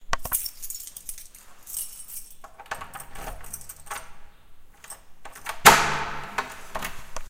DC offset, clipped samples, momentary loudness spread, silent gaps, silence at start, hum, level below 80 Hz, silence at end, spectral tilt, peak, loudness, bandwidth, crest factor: under 0.1%; under 0.1%; 26 LU; none; 0 s; none; -44 dBFS; 0 s; -1 dB/octave; 0 dBFS; -24 LUFS; 16.5 kHz; 28 dB